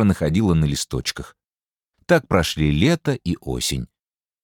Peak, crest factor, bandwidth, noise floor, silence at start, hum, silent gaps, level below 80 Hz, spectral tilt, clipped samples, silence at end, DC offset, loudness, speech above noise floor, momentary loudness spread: -2 dBFS; 18 dB; 18 kHz; under -90 dBFS; 0 s; none; none; -38 dBFS; -5.5 dB/octave; under 0.1%; 0.6 s; under 0.1%; -21 LUFS; over 70 dB; 11 LU